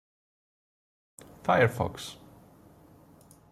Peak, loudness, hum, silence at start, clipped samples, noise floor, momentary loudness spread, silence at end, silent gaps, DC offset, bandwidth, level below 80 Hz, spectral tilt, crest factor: -12 dBFS; -28 LUFS; none; 1.45 s; under 0.1%; -56 dBFS; 18 LU; 1.35 s; none; under 0.1%; 15 kHz; -62 dBFS; -5.5 dB/octave; 22 dB